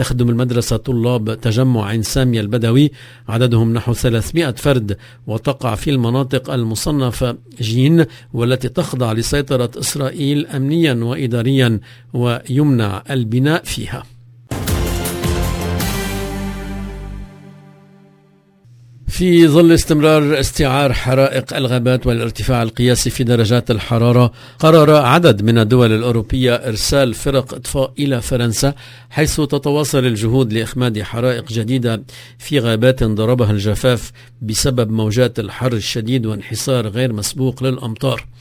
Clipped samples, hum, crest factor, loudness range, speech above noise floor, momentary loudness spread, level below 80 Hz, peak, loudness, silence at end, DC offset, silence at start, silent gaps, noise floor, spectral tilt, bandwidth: under 0.1%; none; 16 dB; 7 LU; 36 dB; 10 LU; -32 dBFS; 0 dBFS; -16 LUFS; 0.1 s; under 0.1%; 0 s; none; -51 dBFS; -6 dB/octave; 16 kHz